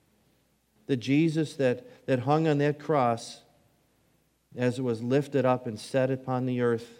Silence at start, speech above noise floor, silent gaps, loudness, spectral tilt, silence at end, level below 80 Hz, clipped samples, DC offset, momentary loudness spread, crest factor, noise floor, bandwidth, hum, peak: 0.9 s; 42 dB; none; -28 LUFS; -7 dB/octave; 0.05 s; -74 dBFS; under 0.1%; under 0.1%; 9 LU; 18 dB; -69 dBFS; 15.5 kHz; none; -10 dBFS